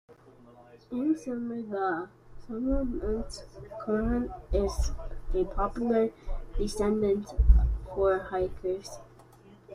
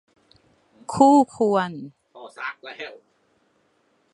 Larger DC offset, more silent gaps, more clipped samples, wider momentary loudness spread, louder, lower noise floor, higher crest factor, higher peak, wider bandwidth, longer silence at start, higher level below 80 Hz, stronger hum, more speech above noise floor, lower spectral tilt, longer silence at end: neither; neither; neither; second, 14 LU vs 25 LU; second, -30 LUFS vs -20 LUFS; second, -54 dBFS vs -65 dBFS; about the same, 22 dB vs 22 dB; second, -6 dBFS vs -2 dBFS; about the same, 11.5 kHz vs 11 kHz; second, 0.1 s vs 0.9 s; first, -32 dBFS vs -66 dBFS; neither; second, 26 dB vs 46 dB; first, -7 dB/octave vs -5.5 dB/octave; second, 0 s vs 1.25 s